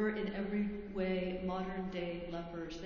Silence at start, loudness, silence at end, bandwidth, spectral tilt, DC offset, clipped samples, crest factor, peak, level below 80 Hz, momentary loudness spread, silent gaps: 0 s; -39 LUFS; 0 s; 7 kHz; -7.5 dB/octave; under 0.1%; under 0.1%; 16 dB; -22 dBFS; -56 dBFS; 6 LU; none